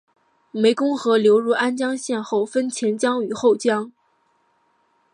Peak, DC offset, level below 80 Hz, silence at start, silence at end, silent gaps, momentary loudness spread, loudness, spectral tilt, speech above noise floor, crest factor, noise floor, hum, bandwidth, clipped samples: -4 dBFS; under 0.1%; -74 dBFS; 0.55 s; 1.25 s; none; 8 LU; -20 LUFS; -4 dB/octave; 45 dB; 16 dB; -64 dBFS; none; 11 kHz; under 0.1%